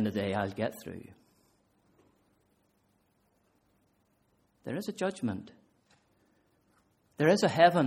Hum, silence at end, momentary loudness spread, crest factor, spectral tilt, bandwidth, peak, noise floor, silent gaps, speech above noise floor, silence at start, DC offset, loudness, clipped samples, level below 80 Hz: none; 0 s; 21 LU; 24 dB; -6 dB/octave; 16 kHz; -8 dBFS; -72 dBFS; none; 43 dB; 0 s; under 0.1%; -30 LUFS; under 0.1%; -72 dBFS